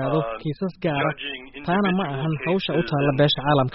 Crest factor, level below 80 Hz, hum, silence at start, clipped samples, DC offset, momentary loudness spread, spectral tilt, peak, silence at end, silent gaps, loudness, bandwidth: 16 dB; -50 dBFS; none; 0 s; under 0.1%; under 0.1%; 9 LU; -4.5 dB/octave; -6 dBFS; 0 s; none; -23 LUFS; 5.8 kHz